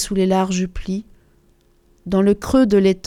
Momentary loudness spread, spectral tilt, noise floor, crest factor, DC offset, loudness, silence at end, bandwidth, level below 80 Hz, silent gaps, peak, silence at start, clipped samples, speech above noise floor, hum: 13 LU; -6 dB/octave; -56 dBFS; 16 dB; under 0.1%; -18 LUFS; 0.1 s; 14.5 kHz; -38 dBFS; none; -4 dBFS; 0 s; under 0.1%; 39 dB; none